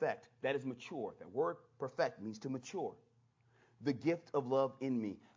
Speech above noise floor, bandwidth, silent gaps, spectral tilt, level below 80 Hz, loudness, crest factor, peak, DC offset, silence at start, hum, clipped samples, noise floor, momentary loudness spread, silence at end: 33 dB; 7.6 kHz; none; -6.5 dB/octave; -82 dBFS; -40 LUFS; 20 dB; -20 dBFS; under 0.1%; 0 s; none; under 0.1%; -72 dBFS; 9 LU; 0.15 s